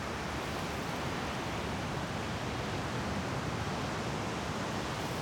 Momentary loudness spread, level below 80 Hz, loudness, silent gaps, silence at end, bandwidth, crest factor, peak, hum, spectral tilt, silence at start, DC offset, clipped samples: 1 LU; -50 dBFS; -36 LUFS; none; 0 s; over 20 kHz; 12 dB; -24 dBFS; none; -5 dB/octave; 0 s; under 0.1%; under 0.1%